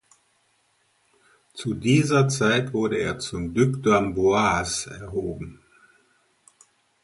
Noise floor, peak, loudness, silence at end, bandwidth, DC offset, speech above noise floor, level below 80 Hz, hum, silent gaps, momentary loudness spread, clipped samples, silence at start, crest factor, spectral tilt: -67 dBFS; -6 dBFS; -23 LUFS; 1.5 s; 11.5 kHz; under 0.1%; 44 dB; -50 dBFS; none; none; 13 LU; under 0.1%; 1.55 s; 18 dB; -5 dB/octave